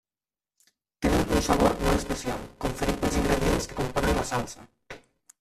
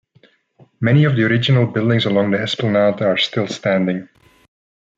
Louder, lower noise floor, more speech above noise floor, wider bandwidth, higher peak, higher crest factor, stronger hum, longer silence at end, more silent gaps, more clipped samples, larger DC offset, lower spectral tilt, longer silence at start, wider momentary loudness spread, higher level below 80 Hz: second, -26 LUFS vs -17 LUFS; first, under -90 dBFS vs -55 dBFS; first, over 64 dB vs 39 dB; first, 15.5 kHz vs 7.8 kHz; second, -8 dBFS vs -4 dBFS; first, 20 dB vs 14 dB; neither; second, 0.45 s vs 0.95 s; neither; neither; neither; second, -5 dB/octave vs -7 dB/octave; first, 1 s vs 0.8 s; first, 21 LU vs 6 LU; first, -36 dBFS vs -60 dBFS